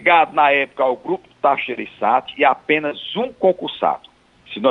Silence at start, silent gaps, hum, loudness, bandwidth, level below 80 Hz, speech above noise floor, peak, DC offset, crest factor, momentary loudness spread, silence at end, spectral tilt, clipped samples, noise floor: 0 s; none; none; -19 LUFS; 7 kHz; -64 dBFS; 21 dB; -2 dBFS; under 0.1%; 16 dB; 10 LU; 0 s; -6.5 dB/octave; under 0.1%; -39 dBFS